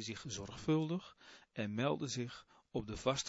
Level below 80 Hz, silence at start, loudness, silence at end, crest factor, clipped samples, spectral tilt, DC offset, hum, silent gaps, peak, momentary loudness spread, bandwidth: -64 dBFS; 0 s; -40 LUFS; 0 s; 20 dB; under 0.1%; -5 dB/octave; under 0.1%; none; none; -20 dBFS; 15 LU; 7.6 kHz